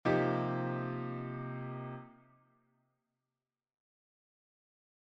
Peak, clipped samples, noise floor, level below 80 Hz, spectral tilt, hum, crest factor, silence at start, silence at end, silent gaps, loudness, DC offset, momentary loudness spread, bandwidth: -18 dBFS; under 0.1%; under -90 dBFS; -72 dBFS; -8.5 dB/octave; none; 20 dB; 0.05 s; 2.95 s; none; -37 LUFS; under 0.1%; 15 LU; 6.2 kHz